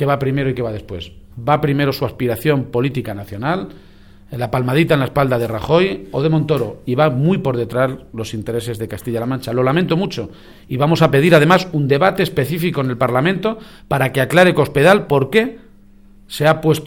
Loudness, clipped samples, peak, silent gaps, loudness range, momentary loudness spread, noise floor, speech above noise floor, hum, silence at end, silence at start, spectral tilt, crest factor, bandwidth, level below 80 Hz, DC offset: -17 LUFS; under 0.1%; 0 dBFS; none; 5 LU; 13 LU; -45 dBFS; 29 dB; none; 0 s; 0 s; -6.5 dB/octave; 16 dB; 18 kHz; -44 dBFS; 0.4%